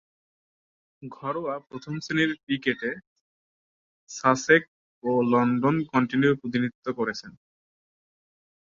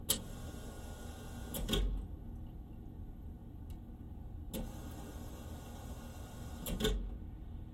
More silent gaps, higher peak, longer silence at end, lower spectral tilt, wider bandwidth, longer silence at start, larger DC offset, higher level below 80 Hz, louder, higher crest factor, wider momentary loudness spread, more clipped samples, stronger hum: first, 2.43-2.47 s, 3.07-4.07 s, 4.68-5.01 s, 6.75-6.82 s vs none; first, -4 dBFS vs -16 dBFS; first, 1.35 s vs 0 s; first, -5.5 dB/octave vs -4 dB/octave; second, 7.6 kHz vs 16 kHz; first, 1 s vs 0 s; neither; second, -68 dBFS vs -46 dBFS; first, -25 LUFS vs -44 LUFS; about the same, 22 dB vs 26 dB; about the same, 15 LU vs 14 LU; neither; neither